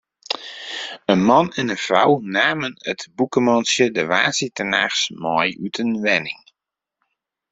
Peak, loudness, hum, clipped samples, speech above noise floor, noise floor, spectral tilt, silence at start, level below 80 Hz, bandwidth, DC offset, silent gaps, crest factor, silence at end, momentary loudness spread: -2 dBFS; -19 LUFS; none; under 0.1%; 66 dB; -85 dBFS; -3.5 dB/octave; 0.3 s; -62 dBFS; 8.2 kHz; under 0.1%; none; 18 dB; 1.15 s; 12 LU